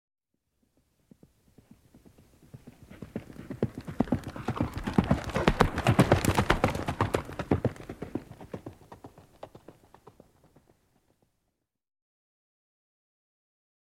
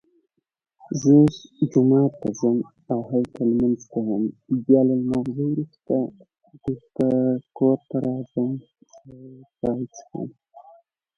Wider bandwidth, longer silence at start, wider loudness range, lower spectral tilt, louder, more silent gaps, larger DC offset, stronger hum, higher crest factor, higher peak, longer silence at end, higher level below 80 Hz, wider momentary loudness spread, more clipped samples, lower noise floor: first, 16.5 kHz vs 7 kHz; first, 2.55 s vs 0.9 s; first, 21 LU vs 6 LU; second, -6 dB/octave vs -8.5 dB/octave; second, -29 LUFS vs -22 LUFS; neither; neither; neither; first, 30 dB vs 18 dB; about the same, -2 dBFS vs -4 dBFS; first, 4.4 s vs 0.55 s; first, -44 dBFS vs -58 dBFS; first, 25 LU vs 14 LU; neither; first, -81 dBFS vs -54 dBFS